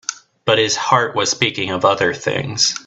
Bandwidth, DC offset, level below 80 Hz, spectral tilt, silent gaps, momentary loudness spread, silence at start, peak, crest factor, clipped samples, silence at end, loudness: 8.4 kHz; under 0.1%; -56 dBFS; -2.5 dB/octave; none; 6 LU; 0.1 s; 0 dBFS; 18 dB; under 0.1%; 0.05 s; -17 LUFS